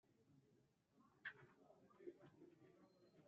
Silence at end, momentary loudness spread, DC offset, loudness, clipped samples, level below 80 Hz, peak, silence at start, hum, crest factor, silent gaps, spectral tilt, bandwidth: 0 s; 11 LU; under 0.1%; -62 LUFS; under 0.1%; under -90 dBFS; -40 dBFS; 0.05 s; none; 26 dB; none; -3.5 dB/octave; 6.2 kHz